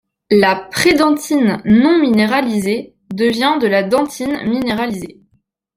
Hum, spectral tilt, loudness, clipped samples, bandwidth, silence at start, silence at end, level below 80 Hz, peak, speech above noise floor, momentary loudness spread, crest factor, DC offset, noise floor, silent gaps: none; -5 dB/octave; -15 LUFS; under 0.1%; 16 kHz; 0.3 s; 0.65 s; -50 dBFS; 0 dBFS; 48 dB; 9 LU; 14 dB; under 0.1%; -62 dBFS; none